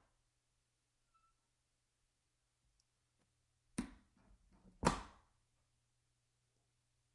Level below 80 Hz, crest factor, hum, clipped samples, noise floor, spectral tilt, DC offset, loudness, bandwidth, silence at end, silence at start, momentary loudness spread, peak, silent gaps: -64 dBFS; 34 dB; none; under 0.1%; -85 dBFS; -4.5 dB/octave; under 0.1%; -43 LUFS; 10.5 kHz; 2.05 s; 3.8 s; 16 LU; -18 dBFS; none